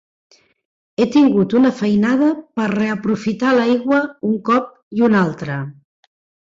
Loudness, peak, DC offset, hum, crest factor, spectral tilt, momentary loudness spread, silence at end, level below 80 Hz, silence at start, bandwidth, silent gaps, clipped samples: -17 LUFS; -4 dBFS; under 0.1%; none; 14 dB; -7 dB/octave; 11 LU; 0.85 s; -58 dBFS; 1 s; 7.8 kHz; 4.83-4.91 s; under 0.1%